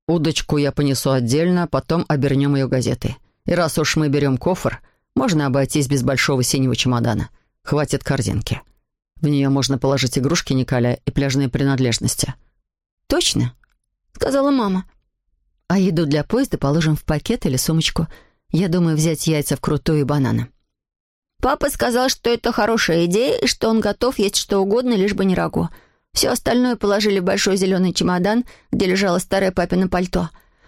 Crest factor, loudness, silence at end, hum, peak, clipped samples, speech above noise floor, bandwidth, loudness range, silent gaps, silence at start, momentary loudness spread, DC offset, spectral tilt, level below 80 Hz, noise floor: 14 dB; -19 LUFS; 0.4 s; none; -6 dBFS; under 0.1%; 49 dB; 16.5 kHz; 3 LU; 12.92-12.97 s, 21.00-21.22 s; 0.1 s; 6 LU; under 0.1%; -5 dB/octave; -40 dBFS; -68 dBFS